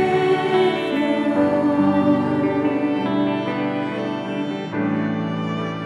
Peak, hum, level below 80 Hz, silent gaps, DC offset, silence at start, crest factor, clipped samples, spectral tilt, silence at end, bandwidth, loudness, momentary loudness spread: -6 dBFS; none; -64 dBFS; none; under 0.1%; 0 s; 14 dB; under 0.1%; -7.5 dB/octave; 0 s; 10 kHz; -21 LUFS; 7 LU